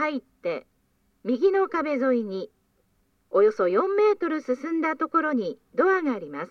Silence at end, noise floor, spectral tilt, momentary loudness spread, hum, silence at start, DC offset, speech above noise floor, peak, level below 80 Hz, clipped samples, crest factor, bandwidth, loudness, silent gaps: 0.05 s; -68 dBFS; -6.5 dB/octave; 10 LU; none; 0 s; under 0.1%; 44 dB; -10 dBFS; -72 dBFS; under 0.1%; 16 dB; 6.6 kHz; -25 LUFS; none